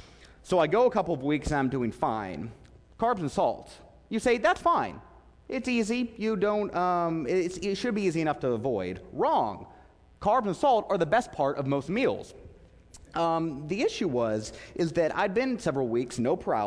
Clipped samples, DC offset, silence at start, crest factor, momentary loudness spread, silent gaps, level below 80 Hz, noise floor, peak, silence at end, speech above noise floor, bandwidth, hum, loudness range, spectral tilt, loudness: under 0.1%; under 0.1%; 0 s; 16 dB; 9 LU; none; -52 dBFS; -53 dBFS; -12 dBFS; 0 s; 25 dB; 11 kHz; none; 2 LU; -6 dB/octave; -28 LUFS